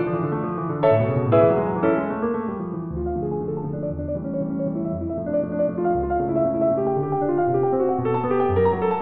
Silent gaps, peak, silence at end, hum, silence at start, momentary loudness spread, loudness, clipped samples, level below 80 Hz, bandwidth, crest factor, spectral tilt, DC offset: none; -6 dBFS; 0 s; none; 0 s; 8 LU; -23 LUFS; under 0.1%; -44 dBFS; 4.2 kHz; 16 dB; -12.5 dB/octave; under 0.1%